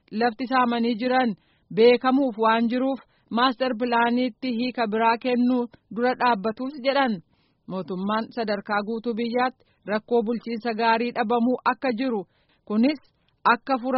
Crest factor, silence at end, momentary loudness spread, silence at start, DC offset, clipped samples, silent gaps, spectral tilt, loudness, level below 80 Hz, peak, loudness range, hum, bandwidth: 18 dB; 0 s; 8 LU; 0.1 s; under 0.1%; under 0.1%; none; -3 dB/octave; -24 LUFS; -68 dBFS; -6 dBFS; 5 LU; none; 5.8 kHz